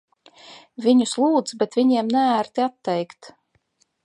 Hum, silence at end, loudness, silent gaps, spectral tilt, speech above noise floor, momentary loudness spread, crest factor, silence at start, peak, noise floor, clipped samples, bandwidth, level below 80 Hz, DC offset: none; 0.75 s; -21 LUFS; none; -4.5 dB/octave; 46 dB; 8 LU; 16 dB; 0.5 s; -6 dBFS; -66 dBFS; under 0.1%; 11 kHz; -74 dBFS; under 0.1%